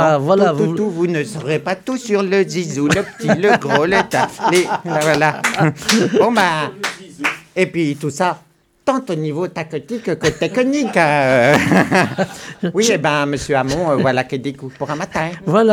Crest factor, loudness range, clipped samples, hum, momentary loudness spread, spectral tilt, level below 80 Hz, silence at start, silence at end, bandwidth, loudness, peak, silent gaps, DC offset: 16 dB; 5 LU; under 0.1%; none; 10 LU; -5 dB/octave; -50 dBFS; 0 s; 0 s; 19.5 kHz; -17 LUFS; 0 dBFS; none; under 0.1%